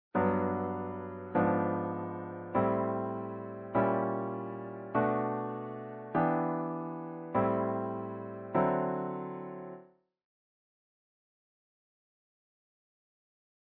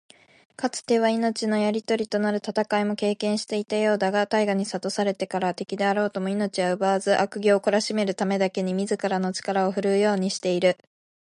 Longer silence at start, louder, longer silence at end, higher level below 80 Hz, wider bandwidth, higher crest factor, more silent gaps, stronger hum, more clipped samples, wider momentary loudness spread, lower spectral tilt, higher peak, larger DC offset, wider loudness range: second, 0.15 s vs 0.6 s; second, -33 LUFS vs -24 LUFS; first, 3.95 s vs 0.5 s; first, -68 dBFS vs -74 dBFS; second, 4.2 kHz vs 11.5 kHz; about the same, 18 dB vs 16 dB; neither; neither; neither; first, 12 LU vs 5 LU; first, -8 dB/octave vs -5 dB/octave; second, -16 dBFS vs -8 dBFS; neither; first, 5 LU vs 1 LU